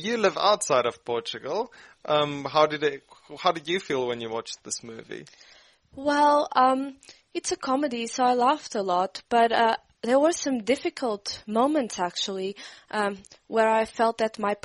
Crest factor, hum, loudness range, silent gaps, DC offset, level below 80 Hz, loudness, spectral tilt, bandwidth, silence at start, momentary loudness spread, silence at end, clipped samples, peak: 20 dB; none; 4 LU; none; under 0.1%; -66 dBFS; -25 LUFS; -3.5 dB/octave; 11.5 kHz; 0 s; 12 LU; 0.1 s; under 0.1%; -6 dBFS